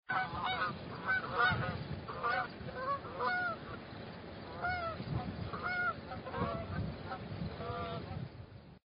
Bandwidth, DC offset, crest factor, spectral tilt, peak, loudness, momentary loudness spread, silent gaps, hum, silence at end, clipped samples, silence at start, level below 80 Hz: 5.2 kHz; under 0.1%; 20 dB; -3.5 dB/octave; -18 dBFS; -38 LUFS; 12 LU; none; none; 0.15 s; under 0.1%; 0.1 s; -56 dBFS